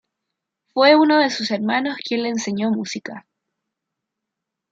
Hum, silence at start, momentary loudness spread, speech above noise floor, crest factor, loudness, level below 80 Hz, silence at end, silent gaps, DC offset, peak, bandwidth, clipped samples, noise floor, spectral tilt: none; 0.75 s; 15 LU; 64 dB; 18 dB; -19 LUFS; -72 dBFS; 1.5 s; none; under 0.1%; -2 dBFS; 7.8 kHz; under 0.1%; -82 dBFS; -4 dB/octave